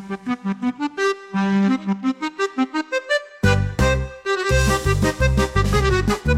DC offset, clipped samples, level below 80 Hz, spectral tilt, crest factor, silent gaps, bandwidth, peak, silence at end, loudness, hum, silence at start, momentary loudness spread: under 0.1%; under 0.1%; -28 dBFS; -5.5 dB/octave; 16 dB; none; 16 kHz; -4 dBFS; 0 s; -21 LUFS; none; 0 s; 6 LU